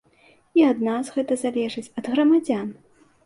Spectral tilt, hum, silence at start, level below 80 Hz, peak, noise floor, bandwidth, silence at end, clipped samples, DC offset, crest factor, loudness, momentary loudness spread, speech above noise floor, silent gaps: -5.5 dB/octave; none; 0.55 s; -68 dBFS; -8 dBFS; -57 dBFS; 11.5 kHz; 0.55 s; under 0.1%; under 0.1%; 16 dB; -22 LUFS; 10 LU; 36 dB; none